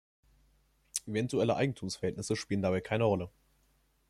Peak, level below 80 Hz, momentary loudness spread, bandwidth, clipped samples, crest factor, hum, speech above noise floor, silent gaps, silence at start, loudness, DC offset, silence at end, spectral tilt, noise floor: -12 dBFS; -64 dBFS; 7 LU; 15 kHz; under 0.1%; 22 dB; none; 39 dB; none; 0.95 s; -33 LUFS; under 0.1%; 0.8 s; -5.5 dB/octave; -71 dBFS